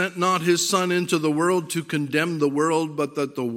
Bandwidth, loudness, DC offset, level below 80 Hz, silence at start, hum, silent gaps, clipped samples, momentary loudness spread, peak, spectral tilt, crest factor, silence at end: 16.5 kHz; -22 LUFS; under 0.1%; -72 dBFS; 0 s; none; none; under 0.1%; 6 LU; -6 dBFS; -4.5 dB/octave; 16 dB; 0 s